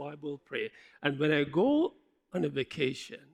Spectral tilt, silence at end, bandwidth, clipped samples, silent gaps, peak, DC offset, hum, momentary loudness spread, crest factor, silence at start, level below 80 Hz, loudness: -6.5 dB/octave; 0.15 s; 10.5 kHz; under 0.1%; none; -12 dBFS; under 0.1%; none; 13 LU; 20 dB; 0 s; -70 dBFS; -32 LUFS